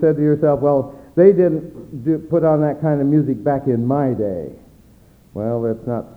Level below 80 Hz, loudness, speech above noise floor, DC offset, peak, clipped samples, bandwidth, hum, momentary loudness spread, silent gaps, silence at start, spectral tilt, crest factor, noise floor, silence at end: -50 dBFS; -18 LUFS; 32 dB; under 0.1%; 0 dBFS; under 0.1%; 4.5 kHz; none; 12 LU; none; 0 s; -11.5 dB/octave; 18 dB; -49 dBFS; 0.05 s